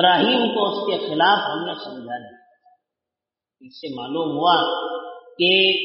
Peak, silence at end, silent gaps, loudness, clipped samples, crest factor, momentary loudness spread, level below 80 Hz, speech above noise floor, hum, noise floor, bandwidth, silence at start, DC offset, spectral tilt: -4 dBFS; 0 s; none; -19 LUFS; under 0.1%; 18 dB; 18 LU; -72 dBFS; 68 dB; none; -88 dBFS; 5.8 kHz; 0 s; under 0.1%; -1 dB/octave